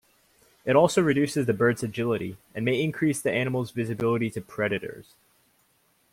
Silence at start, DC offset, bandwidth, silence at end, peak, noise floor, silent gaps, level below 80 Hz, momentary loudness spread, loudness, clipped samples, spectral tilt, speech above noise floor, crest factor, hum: 0.65 s; under 0.1%; 16.5 kHz; 1.1 s; -6 dBFS; -67 dBFS; none; -62 dBFS; 10 LU; -26 LUFS; under 0.1%; -6 dB/octave; 41 dB; 20 dB; none